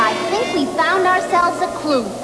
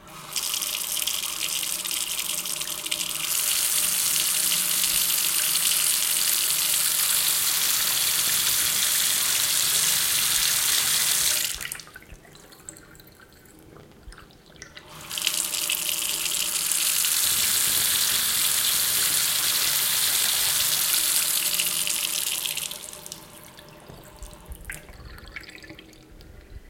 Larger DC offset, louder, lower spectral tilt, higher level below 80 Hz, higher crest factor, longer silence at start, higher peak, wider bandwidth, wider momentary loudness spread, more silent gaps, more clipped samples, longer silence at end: first, 0.1% vs under 0.1%; first, -17 LUFS vs -21 LUFS; first, -3.5 dB/octave vs 1.5 dB/octave; about the same, -52 dBFS vs -54 dBFS; second, 12 dB vs 22 dB; about the same, 0 s vs 0 s; about the same, -6 dBFS vs -4 dBFS; second, 11 kHz vs 17 kHz; second, 4 LU vs 12 LU; neither; neither; about the same, 0 s vs 0 s